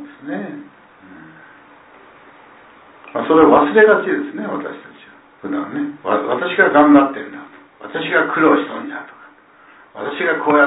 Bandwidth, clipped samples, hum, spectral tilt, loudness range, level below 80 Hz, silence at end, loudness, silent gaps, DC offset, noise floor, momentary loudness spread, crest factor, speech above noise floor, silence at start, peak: 4 kHz; under 0.1%; none; -9.5 dB/octave; 5 LU; -58 dBFS; 0 s; -15 LUFS; none; under 0.1%; -47 dBFS; 21 LU; 18 dB; 32 dB; 0 s; 0 dBFS